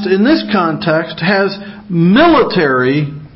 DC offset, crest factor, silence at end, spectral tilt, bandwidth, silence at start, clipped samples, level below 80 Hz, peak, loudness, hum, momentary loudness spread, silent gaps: under 0.1%; 12 dB; 0.1 s; -11 dB/octave; 5.8 kHz; 0 s; under 0.1%; -44 dBFS; 0 dBFS; -12 LUFS; none; 9 LU; none